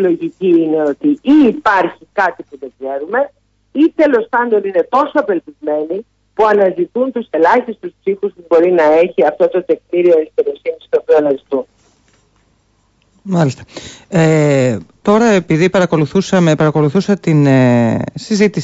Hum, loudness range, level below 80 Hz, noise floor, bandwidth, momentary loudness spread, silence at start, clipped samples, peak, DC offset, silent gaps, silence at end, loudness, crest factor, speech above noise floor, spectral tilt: none; 5 LU; -52 dBFS; -57 dBFS; 8 kHz; 12 LU; 0 s; under 0.1%; -2 dBFS; under 0.1%; none; 0 s; -13 LUFS; 12 dB; 44 dB; -7 dB/octave